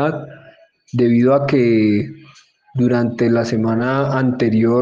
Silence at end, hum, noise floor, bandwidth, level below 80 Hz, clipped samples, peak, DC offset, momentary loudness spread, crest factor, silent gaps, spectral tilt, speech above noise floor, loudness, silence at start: 0 s; none; -47 dBFS; 7.4 kHz; -56 dBFS; under 0.1%; -2 dBFS; under 0.1%; 12 LU; 14 dB; none; -8.5 dB/octave; 31 dB; -16 LUFS; 0 s